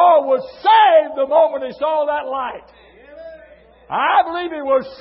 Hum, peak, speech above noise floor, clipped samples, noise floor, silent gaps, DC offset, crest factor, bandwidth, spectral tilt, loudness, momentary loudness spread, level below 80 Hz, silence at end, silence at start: none; -2 dBFS; 28 dB; under 0.1%; -46 dBFS; none; under 0.1%; 14 dB; 5.8 kHz; -8 dB/octave; -16 LUFS; 14 LU; -58 dBFS; 0.05 s; 0 s